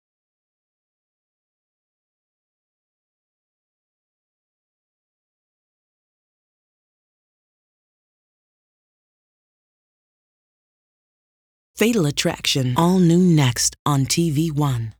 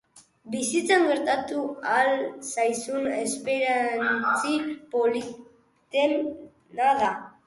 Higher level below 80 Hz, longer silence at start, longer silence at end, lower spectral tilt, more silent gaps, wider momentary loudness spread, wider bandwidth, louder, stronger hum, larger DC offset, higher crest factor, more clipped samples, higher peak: first, -54 dBFS vs -70 dBFS; first, 11.75 s vs 0.15 s; about the same, 0.1 s vs 0.15 s; first, -5 dB/octave vs -2.5 dB/octave; first, 13.79-13.85 s vs none; second, 6 LU vs 9 LU; first, over 20 kHz vs 11.5 kHz; first, -18 LUFS vs -25 LUFS; neither; neither; about the same, 20 dB vs 18 dB; neither; first, -4 dBFS vs -8 dBFS